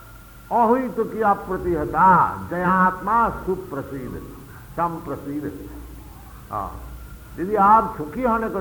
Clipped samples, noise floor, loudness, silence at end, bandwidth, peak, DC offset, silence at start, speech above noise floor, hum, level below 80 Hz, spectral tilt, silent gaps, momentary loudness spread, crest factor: under 0.1%; -43 dBFS; -21 LUFS; 0 s; 19.5 kHz; -4 dBFS; under 0.1%; 0 s; 22 dB; none; -42 dBFS; -7.5 dB/octave; none; 24 LU; 18 dB